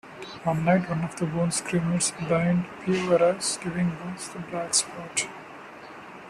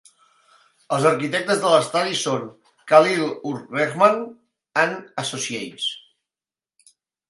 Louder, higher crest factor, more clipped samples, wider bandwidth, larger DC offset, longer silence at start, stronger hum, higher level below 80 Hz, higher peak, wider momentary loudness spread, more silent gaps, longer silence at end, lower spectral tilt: second, -26 LUFS vs -21 LUFS; about the same, 20 dB vs 22 dB; neither; first, 13 kHz vs 11.5 kHz; neither; second, 0.05 s vs 0.9 s; neither; first, -58 dBFS vs -72 dBFS; second, -6 dBFS vs 0 dBFS; first, 18 LU vs 12 LU; neither; second, 0 s vs 1.3 s; about the same, -4.5 dB/octave vs -3.5 dB/octave